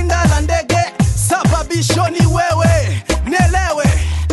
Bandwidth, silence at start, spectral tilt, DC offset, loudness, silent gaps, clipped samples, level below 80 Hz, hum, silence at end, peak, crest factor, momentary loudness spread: 12.5 kHz; 0 s; -5 dB/octave; under 0.1%; -14 LUFS; none; under 0.1%; -20 dBFS; none; 0 s; -2 dBFS; 10 dB; 3 LU